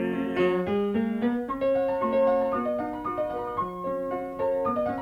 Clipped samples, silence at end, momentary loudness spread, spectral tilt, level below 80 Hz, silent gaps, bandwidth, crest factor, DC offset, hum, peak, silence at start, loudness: under 0.1%; 0 s; 7 LU; -8 dB/octave; -54 dBFS; none; 5.6 kHz; 14 dB; under 0.1%; none; -14 dBFS; 0 s; -27 LUFS